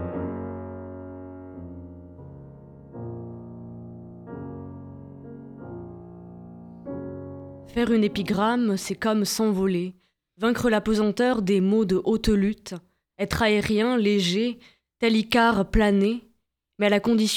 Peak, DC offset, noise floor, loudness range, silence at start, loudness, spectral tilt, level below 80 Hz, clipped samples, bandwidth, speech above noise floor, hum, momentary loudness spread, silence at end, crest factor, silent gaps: -6 dBFS; under 0.1%; -69 dBFS; 17 LU; 0 s; -23 LUFS; -5.5 dB/octave; -44 dBFS; under 0.1%; 15.5 kHz; 47 dB; none; 21 LU; 0 s; 20 dB; none